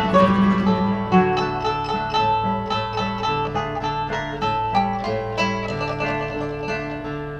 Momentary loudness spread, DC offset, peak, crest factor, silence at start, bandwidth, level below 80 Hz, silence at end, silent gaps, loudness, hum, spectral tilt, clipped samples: 8 LU; under 0.1%; -4 dBFS; 18 dB; 0 s; 7.8 kHz; -42 dBFS; 0 s; none; -22 LUFS; none; -6.5 dB/octave; under 0.1%